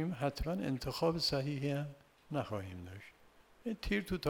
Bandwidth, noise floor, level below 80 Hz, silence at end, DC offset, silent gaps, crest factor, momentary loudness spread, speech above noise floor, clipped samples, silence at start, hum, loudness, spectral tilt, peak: 19.5 kHz; -65 dBFS; -52 dBFS; 0 s; under 0.1%; none; 18 dB; 15 LU; 27 dB; under 0.1%; 0 s; none; -38 LUFS; -6 dB/octave; -20 dBFS